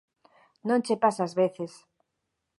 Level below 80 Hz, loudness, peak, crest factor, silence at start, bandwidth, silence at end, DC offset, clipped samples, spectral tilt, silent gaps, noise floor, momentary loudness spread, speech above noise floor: -82 dBFS; -27 LUFS; -10 dBFS; 20 dB; 0.65 s; 11.5 kHz; 0.9 s; under 0.1%; under 0.1%; -6 dB/octave; none; -82 dBFS; 14 LU; 55 dB